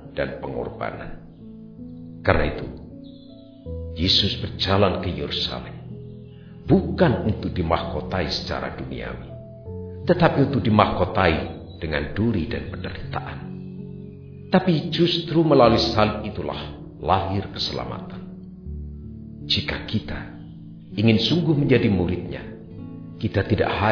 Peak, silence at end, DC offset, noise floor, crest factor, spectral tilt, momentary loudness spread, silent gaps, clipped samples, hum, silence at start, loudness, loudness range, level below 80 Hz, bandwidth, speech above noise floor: 0 dBFS; 0 s; under 0.1%; -44 dBFS; 22 dB; -7 dB/octave; 21 LU; none; under 0.1%; none; 0 s; -22 LUFS; 7 LU; -40 dBFS; 5.4 kHz; 22 dB